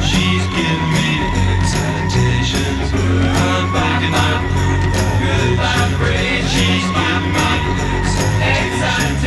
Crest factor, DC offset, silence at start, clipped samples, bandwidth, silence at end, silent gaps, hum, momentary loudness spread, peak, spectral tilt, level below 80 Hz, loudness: 14 dB; under 0.1%; 0 s; under 0.1%; 13 kHz; 0 s; none; none; 2 LU; -2 dBFS; -5 dB/octave; -26 dBFS; -16 LUFS